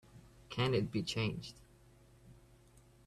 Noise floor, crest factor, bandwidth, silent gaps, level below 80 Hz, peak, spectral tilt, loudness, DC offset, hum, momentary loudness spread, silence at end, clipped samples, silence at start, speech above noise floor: -63 dBFS; 20 dB; 13 kHz; none; -62 dBFS; -20 dBFS; -5.5 dB/octave; -37 LUFS; under 0.1%; none; 13 LU; 0.7 s; under 0.1%; 0.15 s; 27 dB